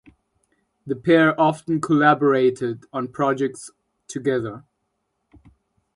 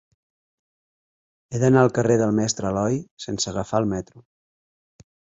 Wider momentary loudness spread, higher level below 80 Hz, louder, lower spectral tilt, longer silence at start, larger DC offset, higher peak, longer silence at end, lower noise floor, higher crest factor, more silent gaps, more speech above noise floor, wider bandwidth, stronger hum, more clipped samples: first, 17 LU vs 14 LU; second, -62 dBFS vs -52 dBFS; about the same, -20 LUFS vs -22 LUFS; about the same, -6.5 dB/octave vs -5.5 dB/octave; second, 0.85 s vs 1.5 s; neither; about the same, -4 dBFS vs -2 dBFS; first, 1.35 s vs 1.2 s; second, -74 dBFS vs under -90 dBFS; about the same, 20 dB vs 22 dB; second, none vs 3.11-3.17 s; second, 54 dB vs over 69 dB; first, 11.5 kHz vs 8 kHz; neither; neither